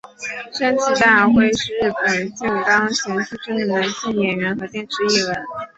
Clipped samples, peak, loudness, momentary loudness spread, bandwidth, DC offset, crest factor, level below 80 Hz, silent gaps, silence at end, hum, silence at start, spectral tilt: under 0.1%; -2 dBFS; -18 LUFS; 13 LU; 8.2 kHz; under 0.1%; 18 dB; -52 dBFS; none; 0.1 s; none; 0.2 s; -3.5 dB/octave